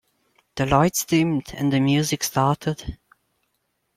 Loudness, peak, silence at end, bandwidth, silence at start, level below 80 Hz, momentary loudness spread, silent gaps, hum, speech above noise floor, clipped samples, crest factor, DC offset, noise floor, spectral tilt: -21 LUFS; -2 dBFS; 1 s; 16 kHz; 0.55 s; -46 dBFS; 11 LU; none; none; 52 dB; under 0.1%; 20 dB; under 0.1%; -73 dBFS; -5 dB/octave